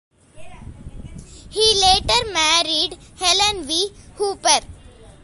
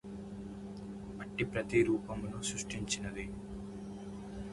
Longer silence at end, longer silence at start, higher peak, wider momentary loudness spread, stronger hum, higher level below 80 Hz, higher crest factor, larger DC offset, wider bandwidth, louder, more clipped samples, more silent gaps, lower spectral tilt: about the same, 0.1 s vs 0 s; first, 0.35 s vs 0.05 s; first, 0 dBFS vs -16 dBFS; about the same, 14 LU vs 15 LU; neither; first, -40 dBFS vs -54 dBFS; about the same, 20 dB vs 22 dB; neither; about the same, 12 kHz vs 11.5 kHz; first, -17 LUFS vs -38 LUFS; neither; neither; second, -1 dB/octave vs -4.5 dB/octave